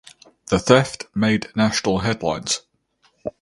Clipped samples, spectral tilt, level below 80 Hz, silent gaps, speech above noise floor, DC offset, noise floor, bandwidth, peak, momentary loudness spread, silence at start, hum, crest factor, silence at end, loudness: under 0.1%; -4.5 dB/octave; -46 dBFS; none; 44 dB; under 0.1%; -63 dBFS; 11.5 kHz; 0 dBFS; 10 LU; 0.5 s; none; 22 dB; 0.1 s; -20 LUFS